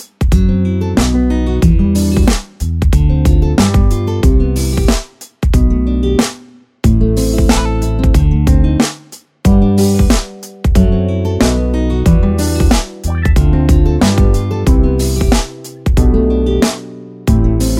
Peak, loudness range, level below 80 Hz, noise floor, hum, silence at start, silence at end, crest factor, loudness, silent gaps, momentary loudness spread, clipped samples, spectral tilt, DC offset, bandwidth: 0 dBFS; 2 LU; -14 dBFS; -40 dBFS; none; 0 s; 0 s; 12 dB; -13 LUFS; none; 6 LU; under 0.1%; -6.5 dB/octave; under 0.1%; 16 kHz